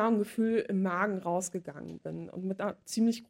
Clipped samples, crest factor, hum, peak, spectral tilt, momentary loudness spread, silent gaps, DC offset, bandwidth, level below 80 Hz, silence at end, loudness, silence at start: under 0.1%; 16 dB; none; -16 dBFS; -5.5 dB/octave; 12 LU; none; under 0.1%; 16 kHz; -72 dBFS; 0.05 s; -32 LUFS; 0 s